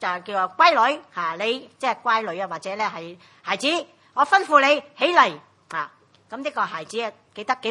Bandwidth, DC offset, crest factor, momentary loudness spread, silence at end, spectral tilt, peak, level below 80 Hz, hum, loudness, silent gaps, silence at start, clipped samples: 11.5 kHz; under 0.1%; 22 dB; 16 LU; 0 s; -2.5 dB/octave; -2 dBFS; -80 dBFS; none; -22 LUFS; none; 0 s; under 0.1%